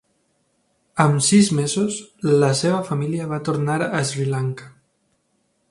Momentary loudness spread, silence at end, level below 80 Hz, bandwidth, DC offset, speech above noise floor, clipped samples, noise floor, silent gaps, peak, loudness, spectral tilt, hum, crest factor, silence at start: 10 LU; 1 s; -60 dBFS; 11.5 kHz; under 0.1%; 48 dB; under 0.1%; -68 dBFS; none; 0 dBFS; -20 LUFS; -5 dB/octave; none; 20 dB; 0.95 s